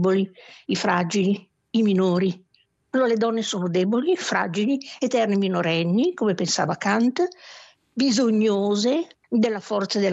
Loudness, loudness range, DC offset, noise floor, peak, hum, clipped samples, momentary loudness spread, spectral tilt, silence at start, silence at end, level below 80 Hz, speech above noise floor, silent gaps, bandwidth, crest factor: -23 LUFS; 1 LU; under 0.1%; -60 dBFS; -8 dBFS; none; under 0.1%; 7 LU; -5 dB/octave; 0 s; 0 s; -72 dBFS; 38 dB; none; 8.2 kHz; 16 dB